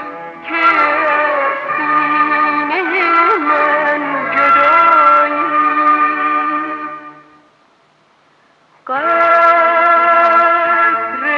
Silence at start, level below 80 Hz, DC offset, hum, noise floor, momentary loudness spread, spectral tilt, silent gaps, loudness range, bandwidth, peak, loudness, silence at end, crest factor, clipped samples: 0 s; -66 dBFS; under 0.1%; none; -53 dBFS; 9 LU; -5 dB/octave; none; 6 LU; 7 kHz; 0 dBFS; -12 LUFS; 0 s; 14 dB; under 0.1%